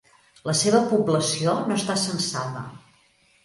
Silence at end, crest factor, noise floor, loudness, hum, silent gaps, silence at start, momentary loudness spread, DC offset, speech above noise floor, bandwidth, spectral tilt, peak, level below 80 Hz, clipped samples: 0.7 s; 20 dB; -61 dBFS; -23 LUFS; none; none; 0.45 s; 14 LU; under 0.1%; 38 dB; 11.5 kHz; -4 dB/octave; -4 dBFS; -64 dBFS; under 0.1%